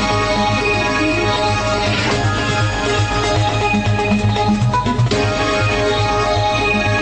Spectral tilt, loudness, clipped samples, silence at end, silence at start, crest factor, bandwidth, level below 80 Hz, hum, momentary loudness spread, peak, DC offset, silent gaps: -5 dB/octave; -16 LUFS; under 0.1%; 0 s; 0 s; 12 dB; 9.4 kHz; -30 dBFS; none; 1 LU; -4 dBFS; under 0.1%; none